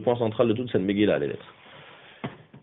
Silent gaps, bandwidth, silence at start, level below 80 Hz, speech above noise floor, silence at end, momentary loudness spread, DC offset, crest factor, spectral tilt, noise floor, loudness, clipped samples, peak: none; 4 kHz; 0 s; -62 dBFS; 24 dB; 0.05 s; 23 LU; under 0.1%; 18 dB; -5.5 dB/octave; -49 dBFS; -25 LUFS; under 0.1%; -8 dBFS